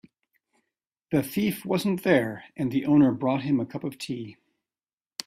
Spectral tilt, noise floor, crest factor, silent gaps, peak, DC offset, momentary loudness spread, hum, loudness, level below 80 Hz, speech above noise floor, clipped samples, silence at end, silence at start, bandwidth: -6.5 dB/octave; under -90 dBFS; 20 dB; none; -6 dBFS; under 0.1%; 14 LU; none; -26 LUFS; -62 dBFS; over 65 dB; under 0.1%; 0.95 s; 1.1 s; 16 kHz